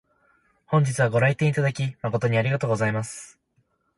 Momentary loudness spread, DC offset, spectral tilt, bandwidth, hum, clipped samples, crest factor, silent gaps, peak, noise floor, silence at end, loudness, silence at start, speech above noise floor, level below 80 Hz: 8 LU; under 0.1%; -6.5 dB/octave; 11.5 kHz; none; under 0.1%; 16 dB; none; -8 dBFS; -69 dBFS; 0.7 s; -23 LUFS; 0.7 s; 47 dB; -58 dBFS